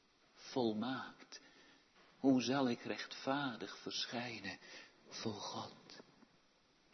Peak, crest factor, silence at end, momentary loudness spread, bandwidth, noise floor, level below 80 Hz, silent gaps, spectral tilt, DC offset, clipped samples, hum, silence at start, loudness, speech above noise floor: -22 dBFS; 20 dB; 0.9 s; 21 LU; 6.2 kHz; -72 dBFS; -84 dBFS; none; -3.5 dB/octave; under 0.1%; under 0.1%; none; 0.35 s; -41 LUFS; 32 dB